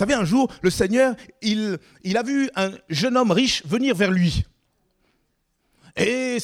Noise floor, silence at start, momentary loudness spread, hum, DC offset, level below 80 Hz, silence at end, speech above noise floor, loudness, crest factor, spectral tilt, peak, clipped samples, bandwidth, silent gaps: -70 dBFS; 0 s; 9 LU; none; under 0.1%; -44 dBFS; 0 s; 49 dB; -21 LUFS; 16 dB; -5 dB/octave; -6 dBFS; under 0.1%; 16 kHz; none